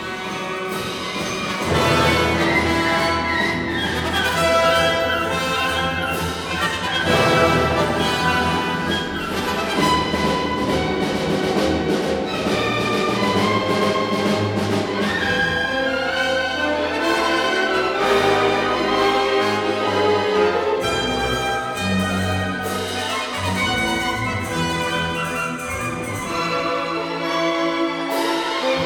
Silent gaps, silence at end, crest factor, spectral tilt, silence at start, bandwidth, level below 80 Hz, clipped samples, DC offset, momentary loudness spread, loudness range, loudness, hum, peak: none; 0 s; 16 dB; -4.5 dB/octave; 0 s; 19.5 kHz; -42 dBFS; under 0.1%; under 0.1%; 7 LU; 4 LU; -20 LUFS; none; -4 dBFS